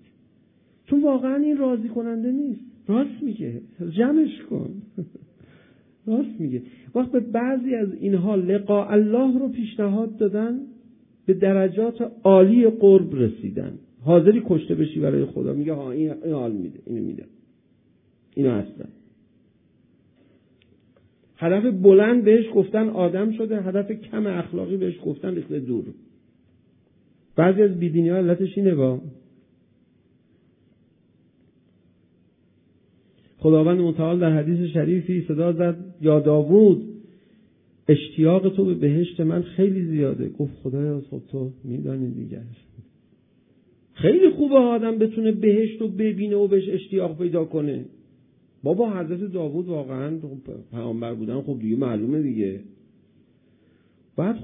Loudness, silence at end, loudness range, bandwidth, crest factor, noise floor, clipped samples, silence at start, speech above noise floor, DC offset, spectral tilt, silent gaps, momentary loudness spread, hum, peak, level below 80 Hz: -21 LUFS; 0 s; 10 LU; 3.8 kHz; 20 dB; -61 dBFS; under 0.1%; 0.9 s; 40 dB; under 0.1%; -12.5 dB/octave; none; 15 LU; none; -2 dBFS; -64 dBFS